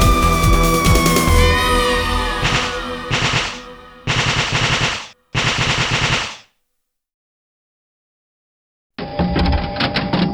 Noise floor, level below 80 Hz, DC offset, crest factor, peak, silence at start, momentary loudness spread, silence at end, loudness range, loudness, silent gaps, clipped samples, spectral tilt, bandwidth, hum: -73 dBFS; -24 dBFS; under 0.1%; 18 dB; 0 dBFS; 0 s; 11 LU; 0 s; 10 LU; -16 LUFS; 7.14-8.90 s; under 0.1%; -4 dB/octave; over 20 kHz; none